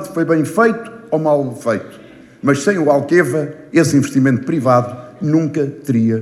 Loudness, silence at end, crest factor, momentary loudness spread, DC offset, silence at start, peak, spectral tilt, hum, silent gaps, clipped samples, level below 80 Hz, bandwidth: -16 LUFS; 0 s; 16 dB; 8 LU; under 0.1%; 0 s; 0 dBFS; -6.5 dB/octave; none; none; under 0.1%; -60 dBFS; 13.5 kHz